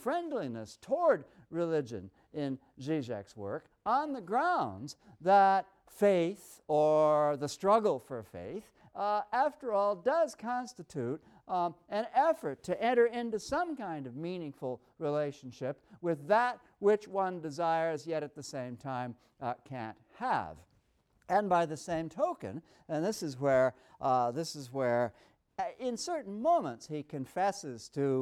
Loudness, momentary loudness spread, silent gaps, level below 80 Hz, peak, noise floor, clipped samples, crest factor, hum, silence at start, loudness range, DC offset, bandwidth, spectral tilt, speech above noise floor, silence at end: -33 LUFS; 14 LU; none; -72 dBFS; -14 dBFS; -72 dBFS; under 0.1%; 18 dB; none; 0 s; 6 LU; under 0.1%; 14.5 kHz; -5.5 dB/octave; 39 dB; 0 s